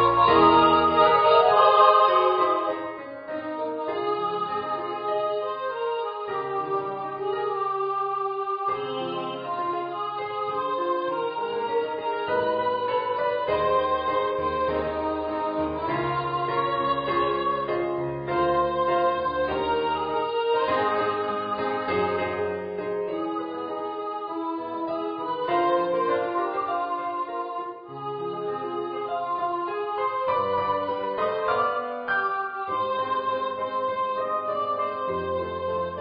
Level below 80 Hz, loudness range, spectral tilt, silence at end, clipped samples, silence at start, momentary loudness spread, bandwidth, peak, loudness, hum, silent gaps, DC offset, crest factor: -54 dBFS; 6 LU; -9.5 dB/octave; 0 s; under 0.1%; 0 s; 12 LU; 5.2 kHz; -6 dBFS; -25 LUFS; none; none; under 0.1%; 20 dB